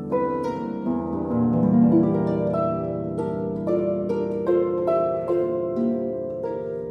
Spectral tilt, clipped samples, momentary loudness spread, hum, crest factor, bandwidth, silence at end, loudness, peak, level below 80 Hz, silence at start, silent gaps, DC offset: -10.5 dB/octave; under 0.1%; 9 LU; none; 14 dB; 6 kHz; 0 s; -23 LUFS; -8 dBFS; -52 dBFS; 0 s; none; under 0.1%